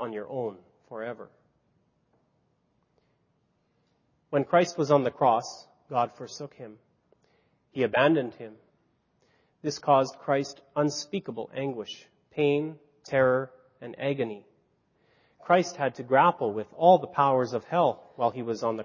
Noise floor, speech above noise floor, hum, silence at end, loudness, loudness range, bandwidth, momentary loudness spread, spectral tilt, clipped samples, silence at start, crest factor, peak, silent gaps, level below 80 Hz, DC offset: -72 dBFS; 45 dB; none; 0 s; -27 LUFS; 7 LU; 7.4 kHz; 19 LU; -5.5 dB/octave; under 0.1%; 0 s; 22 dB; -8 dBFS; none; -72 dBFS; under 0.1%